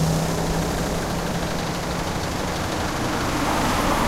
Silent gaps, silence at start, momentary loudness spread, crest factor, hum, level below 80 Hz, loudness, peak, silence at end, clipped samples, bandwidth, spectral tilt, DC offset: none; 0 s; 4 LU; 16 dB; none; -34 dBFS; -24 LUFS; -8 dBFS; 0 s; under 0.1%; 16 kHz; -4.5 dB/octave; under 0.1%